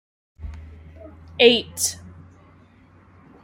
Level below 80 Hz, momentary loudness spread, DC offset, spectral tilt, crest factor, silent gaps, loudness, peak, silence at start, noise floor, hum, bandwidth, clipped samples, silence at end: -48 dBFS; 26 LU; under 0.1%; -2 dB/octave; 24 dB; none; -18 LUFS; -2 dBFS; 0.4 s; -52 dBFS; none; 16 kHz; under 0.1%; 1.5 s